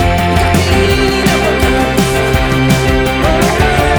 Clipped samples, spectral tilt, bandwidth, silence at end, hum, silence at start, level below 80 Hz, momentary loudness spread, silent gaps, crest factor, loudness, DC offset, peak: under 0.1%; -5 dB/octave; over 20 kHz; 0 s; none; 0 s; -20 dBFS; 1 LU; none; 10 dB; -11 LUFS; under 0.1%; 0 dBFS